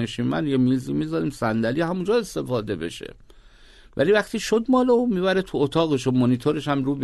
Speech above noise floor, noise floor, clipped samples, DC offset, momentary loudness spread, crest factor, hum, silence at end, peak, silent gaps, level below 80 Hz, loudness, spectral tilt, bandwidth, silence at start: 27 dB; -49 dBFS; under 0.1%; under 0.1%; 7 LU; 16 dB; none; 0 s; -8 dBFS; none; -50 dBFS; -22 LUFS; -6.5 dB/octave; 12.5 kHz; 0 s